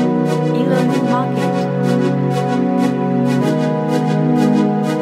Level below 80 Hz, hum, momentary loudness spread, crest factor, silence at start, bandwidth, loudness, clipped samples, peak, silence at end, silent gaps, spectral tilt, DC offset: -62 dBFS; none; 3 LU; 14 dB; 0 s; 13.5 kHz; -16 LUFS; under 0.1%; -2 dBFS; 0 s; none; -7.5 dB/octave; under 0.1%